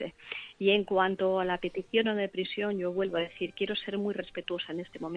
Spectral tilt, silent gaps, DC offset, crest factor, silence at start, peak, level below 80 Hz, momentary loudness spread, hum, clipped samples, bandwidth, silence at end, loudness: -7 dB/octave; none; under 0.1%; 18 dB; 0 s; -12 dBFS; -64 dBFS; 10 LU; none; under 0.1%; 7.4 kHz; 0 s; -31 LUFS